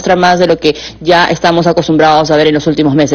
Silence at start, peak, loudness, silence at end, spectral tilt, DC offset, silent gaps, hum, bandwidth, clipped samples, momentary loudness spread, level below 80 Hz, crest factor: 0 s; 0 dBFS; -9 LUFS; 0 s; -5.5 dB/octave; under 0.1%; none; none; 7.6 kHz; 0.5%; 3 LU; -38 dBFS; 8 dB